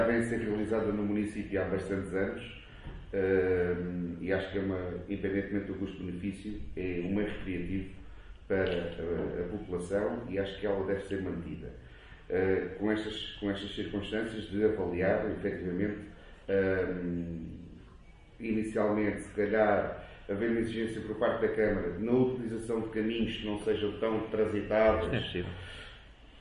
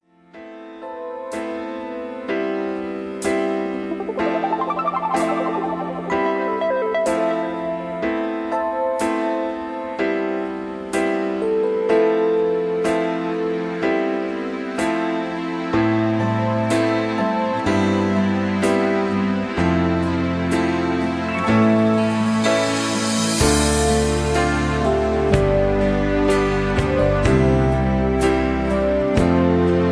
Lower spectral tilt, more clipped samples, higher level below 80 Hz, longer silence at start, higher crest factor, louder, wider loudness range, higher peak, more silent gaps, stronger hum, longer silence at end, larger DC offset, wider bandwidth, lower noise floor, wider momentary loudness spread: first, -7 dB/octave vs -5.5 dB/octave; neither; second, -50 dBFS vs -34 dBFS; second, 0 s vs 0.35 s; about the same, 20 dB vs 18 dB; second, -33 LUFS vs -20 LUFS; about the same, 4 LU vs 5 LU; second, -12 dBFS vs -2 dBFS; neither; neither; about the same, 0 s vs 0 s; neither; about the same, 11.5 kHz vs 11 kHz; first, -54 dBFS vs -42 dBFS; first, 14 LU vs 9 LU